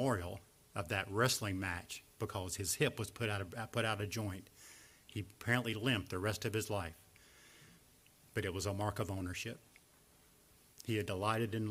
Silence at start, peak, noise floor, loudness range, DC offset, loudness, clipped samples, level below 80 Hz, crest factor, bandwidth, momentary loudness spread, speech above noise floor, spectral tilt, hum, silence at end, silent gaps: 0 s; -18 dBFS; -67 dBFS; 6 LU; under 0.1%; -39 LUFS; under 0.1%; -64 dBFS; 22 dB; 16 kHz; 16 LU; 28 dB; -4.5 dB/octave; none; 0 s; none